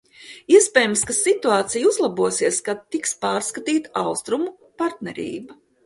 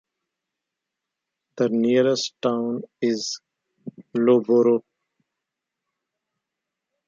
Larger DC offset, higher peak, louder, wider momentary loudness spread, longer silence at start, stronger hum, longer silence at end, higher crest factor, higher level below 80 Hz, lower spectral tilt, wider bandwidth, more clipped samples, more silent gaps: neither; first, 0 dBFS vs -6 dBFS; about the same, -20 LUFS vs -22 LUFS; about the same, 14 LU vs 15 LU; second, 0.2 s vs 1.55 s; neither; second, 0.3 s vs 2.3 s; about the same, 20 dB vs 18 dB; first, -62 dBFS vs -76 dBFS; second, -2.5 dB/octave vs -5 dB/octave; first, 12 kHz vs 7.6 kHz; neither; neither